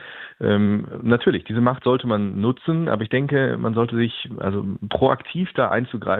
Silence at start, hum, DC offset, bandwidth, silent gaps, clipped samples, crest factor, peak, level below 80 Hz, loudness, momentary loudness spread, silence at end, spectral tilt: 0 s; none; under 0.1%; 4.2 kHz; none; under 0.1%; 20 dB; -2 dBFS; -56 dBFS; -21 LUFS; 6 LU; 0 s; -10 dB/octave